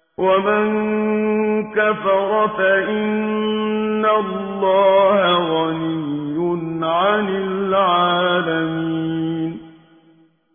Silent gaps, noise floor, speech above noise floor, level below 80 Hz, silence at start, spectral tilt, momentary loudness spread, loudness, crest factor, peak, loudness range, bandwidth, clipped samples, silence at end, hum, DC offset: none; -54 dBFS; 37 dB; -58 dBFS; 0.2 s; -10 dB/octave; 7 LU; -18 LUFS; 14 dB; -4 dBFS; 2 LU; 3.6 kHz; under 0.1%; 0.85 s; none; under 0.1%